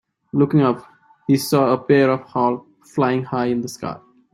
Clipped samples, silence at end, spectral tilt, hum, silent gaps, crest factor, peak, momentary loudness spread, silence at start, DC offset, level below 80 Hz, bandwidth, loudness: under 0.1%; 0.35 s; -6.5 dB/octave; none; none; 16 dB; -4 dBFS; 14 LU; 0.35 s; under 0.1%; -60 dBFS; 16.5 kHz; -19 LUFS